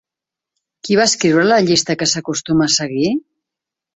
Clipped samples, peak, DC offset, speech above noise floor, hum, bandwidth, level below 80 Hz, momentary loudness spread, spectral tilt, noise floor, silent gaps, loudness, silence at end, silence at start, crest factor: under 0.1%; -2 dBFS; under 0.1%; 71 dB; none; 8.4 kHz; -54 dBFS; 7 LU; -3.5 dB/octave; -86 dBFS; none; -15 LUFS; 0.75 s; 0.85 s; 16 dB